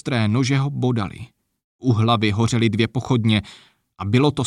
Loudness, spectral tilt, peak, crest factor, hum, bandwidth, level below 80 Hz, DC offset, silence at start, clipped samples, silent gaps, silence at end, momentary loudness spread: -20 LUFS; -6.5 dB/octave; -4 dBFS; 16 dB; none; 11 kHz; -52 dBFS; under 0.1%; 0.05 s; under 0.1%; 1.64-1.79 s; 0 s; 8 LU